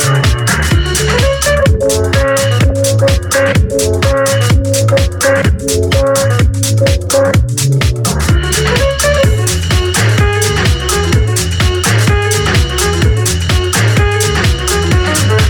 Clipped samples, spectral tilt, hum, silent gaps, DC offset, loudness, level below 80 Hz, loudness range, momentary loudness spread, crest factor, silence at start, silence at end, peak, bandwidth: under 0.1%; -4.5 dB/octave; none; none; under 0.1%; -11 LUFS; -18 dBFS; 0 LU; 2 LU; 10 dB; 0 s; 0 s; 0 dBFS; 20 kHz